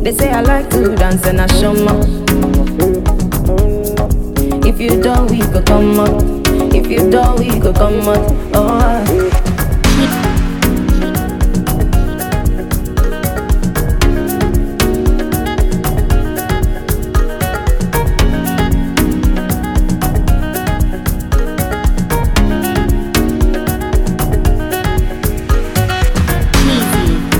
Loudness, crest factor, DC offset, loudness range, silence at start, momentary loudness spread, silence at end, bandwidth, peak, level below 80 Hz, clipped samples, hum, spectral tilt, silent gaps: -14 LUFS; 12 dB; under 0.1%; 4 LU; 0 s; 5 LU; 0 s; 17.5 kHz; 0 dBFS; -14 dBFS; under 0.1%; none; -5.5 dB/octave; none